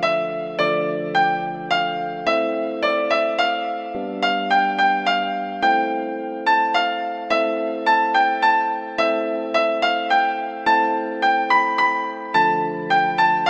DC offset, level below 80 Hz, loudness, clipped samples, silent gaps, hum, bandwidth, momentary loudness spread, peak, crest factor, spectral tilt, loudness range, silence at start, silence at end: under 0.1%; -64 dBFS; -20 LUFS; under 0.1%; none; none; 9 kHz; 7 LU; -6 dBFS; 14 dB; -4.5 dB/octave; 2 LU; 0 s; 0 s